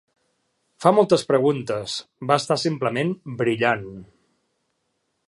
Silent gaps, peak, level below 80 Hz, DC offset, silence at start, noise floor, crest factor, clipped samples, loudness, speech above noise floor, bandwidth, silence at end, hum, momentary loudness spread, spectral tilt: none; -2 dBFS; -64 dBFS; under 0.1%; 0.8 s; -73 dBFS; 20 dB; under 0.1%; -22 LUFS; 52 dB; 11.5 kHz; 1.25 s; none; 9 LU; -5.5 dB/octave